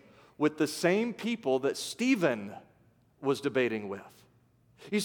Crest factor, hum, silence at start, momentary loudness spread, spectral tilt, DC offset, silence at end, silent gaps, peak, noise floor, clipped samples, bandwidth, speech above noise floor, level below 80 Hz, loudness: 20 dB; none; 0.4 s; 12 LU; -4.5 dB/octave; under 0.1%; 0 s; none; -12 dBFS; -65 dBFS; under 0.1%; 19 kHz; 35 dB; -78 dBFS; -30 LUFS